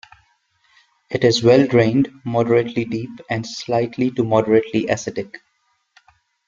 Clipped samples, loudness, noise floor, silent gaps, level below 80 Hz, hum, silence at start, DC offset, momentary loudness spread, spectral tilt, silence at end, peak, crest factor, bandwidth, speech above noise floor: under 0.1%; -18 LUFS; -67 dBFS; none; -56 dBFS; none; 1.1 s; under 0.1%; 14 LU; -6 dB/octave; 1.1 s; -2 dBFS; 18 dB; 7.6 kHz; 49 dB